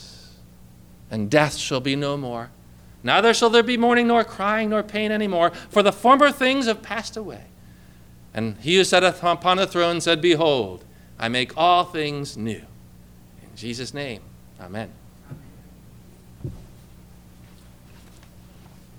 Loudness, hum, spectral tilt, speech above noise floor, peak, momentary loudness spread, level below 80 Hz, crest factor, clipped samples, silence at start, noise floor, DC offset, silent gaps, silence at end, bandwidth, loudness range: -20 LUFS; 60 Hz at -50 dBFS; -4 dB/octave; 26 dB; -4 dBFS; 19 LU; -52 dBFS; 20 dB; under 0.1%; 0 s; -47 dBFS; under 0.1%; none; 2.3 s; 18.5 kHz; 17 LU